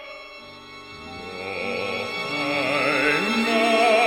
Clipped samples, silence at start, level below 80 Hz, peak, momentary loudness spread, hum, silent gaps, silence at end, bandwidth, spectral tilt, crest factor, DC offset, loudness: under 0.1%; 0 s; -60 dBFS; -6 dBFS; 21 LU; none; none; 0 s; 17 kHz; -3.5 dB/octave; 16 dB; under 0.1%; -22 LUFS